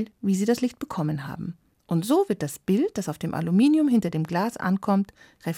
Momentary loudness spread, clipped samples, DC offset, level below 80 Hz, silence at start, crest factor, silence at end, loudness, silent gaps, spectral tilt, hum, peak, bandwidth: 11 LU; under 0.1%; under 0.1%; -62 dBFS; 0 s; 14 dB; 0 s; -25 LUFS; none; -6.5 dB/octave; none; -10 dBFS; 16.5 kHz